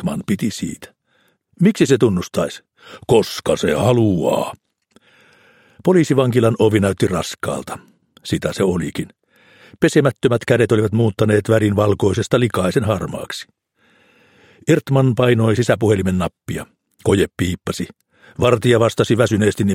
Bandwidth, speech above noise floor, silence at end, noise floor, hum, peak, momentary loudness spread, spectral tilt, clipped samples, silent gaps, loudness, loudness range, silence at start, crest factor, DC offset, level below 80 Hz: 16.5 kHz; 45 dB; 0 s; -61 dBFS; none; 0 dBFS; 13 LU; -6.5 dB/octave; under 0.1%; none; -17 LUFS; 3 LU; 0 s; 16 dB; under 0.1%; -48 dBFS